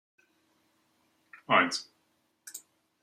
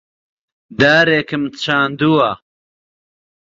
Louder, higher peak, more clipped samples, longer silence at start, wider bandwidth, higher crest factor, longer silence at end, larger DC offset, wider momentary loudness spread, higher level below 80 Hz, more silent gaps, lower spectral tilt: second, -27 LUFS vs -14 LUFS; second, -8 dBFS vs 0 dBFS; neither; first, 1.5 s vs 0.7 s; first, 15.5 kHz vs 7.8 kHz; first, 26 dB vs 18 dB; second, 0.45 s vs 1.15 s; neither; first, 21 LU vs 12 LU; second, -84 dBFS vs -52 dBFS; neither; second, -2.5 dB/octave vs -5.5 dB/octave